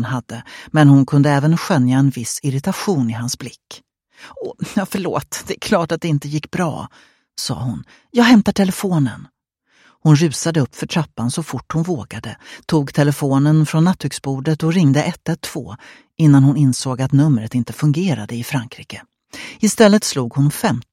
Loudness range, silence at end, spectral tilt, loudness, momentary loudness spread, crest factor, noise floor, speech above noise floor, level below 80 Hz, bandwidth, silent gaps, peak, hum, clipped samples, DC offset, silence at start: 6 LU; 0.1 s; -6 dB/octave; -17 LUFS; 19 LU; 18 dB; -60 dBFS; 43 dB; -52 dBFS; 15.5 kHz; none; 0 dBFS; none; under 0.1%; under 0.1%; 0 s